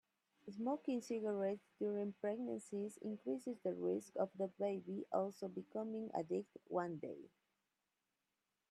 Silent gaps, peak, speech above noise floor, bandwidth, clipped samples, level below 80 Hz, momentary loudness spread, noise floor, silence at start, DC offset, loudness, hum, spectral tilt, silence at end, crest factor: none; -26 dBFS; 46 dB; 13.5 kHz; under 0.1%; -90 dBFS; 6 LU; -90 dBFS; 0.45 s; under 0.1%; -44 LUFS; none; -7 dB/octave; 1.45 s; 18 dB